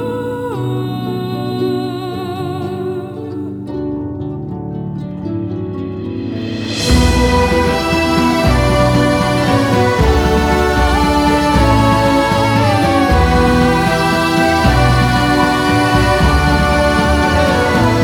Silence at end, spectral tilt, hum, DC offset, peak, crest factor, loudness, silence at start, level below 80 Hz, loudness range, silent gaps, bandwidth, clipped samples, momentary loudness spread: 0 s; -6 dB/octave; none; under 0.1%; 0 dBFS; 12 dB; -14 LUFS; 0 s; -22 dBFS; 10 LU; none; 18 kHz; under 0.1%; 11 LU